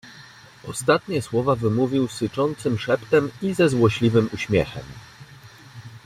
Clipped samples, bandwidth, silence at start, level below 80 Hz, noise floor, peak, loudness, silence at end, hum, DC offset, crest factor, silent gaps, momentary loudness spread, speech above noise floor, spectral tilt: under 0.1%; 15.5 kHz; 0.05 s; -52 dBFS; -46 dBFS; -4 dBFS; -22 LUFS; 0.05 s; none; under 0.1%; 18 dB; none; 22 LU; 25 dB; -6 dB/octave